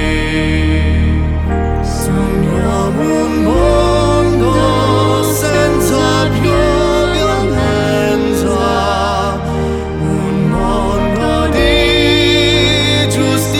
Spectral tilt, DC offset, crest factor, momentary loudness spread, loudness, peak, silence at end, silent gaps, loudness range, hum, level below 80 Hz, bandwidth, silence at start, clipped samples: -5.5 dB/octave; under 0.1%; 12 dB; 6 LU; -13 LUFS; 0 dBFS; 0 s; none; 3 LU; none; -20 dBFS; 18 kHz; 0 s; under 0.1%